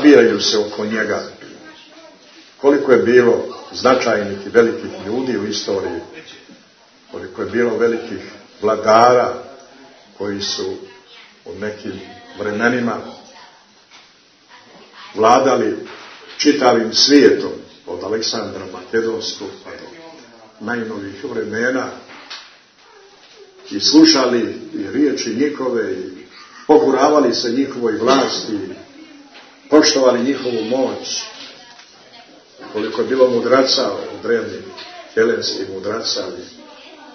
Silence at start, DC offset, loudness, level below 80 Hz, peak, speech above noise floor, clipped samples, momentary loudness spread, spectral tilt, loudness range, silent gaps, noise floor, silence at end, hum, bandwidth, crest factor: 0 s; under 0.1%; -16 LUFS; -62 dBFS; 0 dBFS; 33 dB; under 0.1%; 22 LU; -3.5 dB/octave; 9 LU; none; -50 dBFS; 0.05 s; none; 6.6 kHz; 18 dB